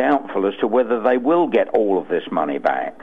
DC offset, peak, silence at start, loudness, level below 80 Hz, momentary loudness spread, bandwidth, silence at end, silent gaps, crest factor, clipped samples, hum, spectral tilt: 0.6%; -4 dBFS; 0 s; -19 LUFS; -62 dBFS; 5 LU; 4.9 kHz; 0.1 s; none; 14 dB; under 0.1%; none; -7.5 dB/octave